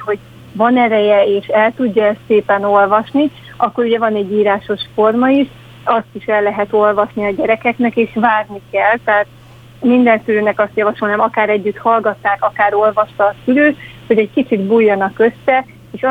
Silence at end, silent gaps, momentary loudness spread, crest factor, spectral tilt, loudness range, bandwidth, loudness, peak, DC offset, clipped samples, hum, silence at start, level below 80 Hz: 0 s; none; 6 LU; 14 dB; -7.5 dB/octave; 2 LU; 4.9 kHz; -14 LUFS; 0 dBFS; under 0.1%; under 0.1%; none; 0 s; -52 dBFS